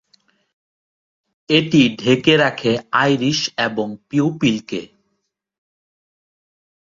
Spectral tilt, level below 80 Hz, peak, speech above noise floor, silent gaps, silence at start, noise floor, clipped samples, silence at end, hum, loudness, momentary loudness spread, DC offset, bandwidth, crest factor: -5 dB/octave; -58 dBFS; -2 dBFS; 56 dB; none; 1.5 s; -73 dBFS; under 0.1%; 2.05 s; none; -17 LUFS; 10 LU; under 0.1%; 7.6 kHz; 18 dB